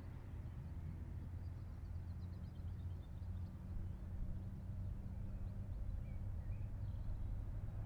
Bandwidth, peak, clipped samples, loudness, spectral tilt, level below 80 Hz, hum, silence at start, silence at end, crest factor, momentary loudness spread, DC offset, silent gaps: 6 kHz; -34 dBFS; under 0.1%; -49 LUFS; -9 dB/octave; -50 dBFS; none; 0 s; 0 s; 12 dB; 3 LU; under 0.1%; none